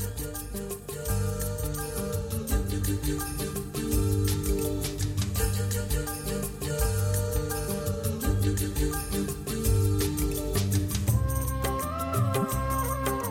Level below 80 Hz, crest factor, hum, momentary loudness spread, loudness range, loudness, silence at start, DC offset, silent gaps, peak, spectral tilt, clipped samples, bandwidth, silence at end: -34 dBFS; 14 dB; none; 5 LU; 3 LU; -29 LUFS; 0 s; under 0.1%; none; -14 dBFS; -5 dB/octave; under 0.1%; 17 kHz; 0 s